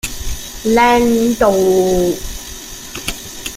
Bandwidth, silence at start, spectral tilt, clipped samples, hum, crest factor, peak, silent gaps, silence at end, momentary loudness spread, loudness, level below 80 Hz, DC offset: 16.5 kHz; 0.05 s; -4 dB/octave; under 0.1%; none; 14 dB; 0 dBFS; none; 0 s; 16 LU; -14 LUFS; -32 dBFS; under 0.1%